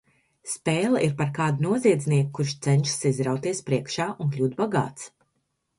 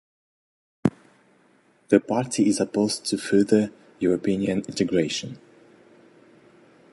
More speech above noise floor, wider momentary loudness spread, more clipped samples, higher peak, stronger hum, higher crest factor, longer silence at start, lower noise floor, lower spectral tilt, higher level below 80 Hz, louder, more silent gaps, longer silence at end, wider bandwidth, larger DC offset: first, 51 dB vs 38 dB; about the same, 8 LU vs 7 LU; neither; second, -8 dBFS vs -4 dBFS; neither; about the same, 18 dB vs 22 dB; second, 0.45 s vs 0.85 s; first, -75 dBFS vs -60 dBFS; about the same, -5.5 dB/octave vs -5 dB/octave; about the same, -62 dBFS vs -60 dBFS; about the same, -25 LUFS vs -24 LUFS; neither; second, 0.7 s vs 1.55 s; about the same, 11.5 kHz vs 11.5 kHz; neither